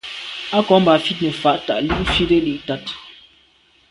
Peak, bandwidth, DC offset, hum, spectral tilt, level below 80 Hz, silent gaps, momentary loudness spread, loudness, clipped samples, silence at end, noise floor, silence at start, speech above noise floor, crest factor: 0 dBFS; 11.5 kHz; under 0.1%; none; -6 dB/octave; -38 dBFS; none; 14 LU; -18 LUFS; under 0.1%; 0.8 s; -55 dBFS; 0.05 s; 38 dB; 18 dB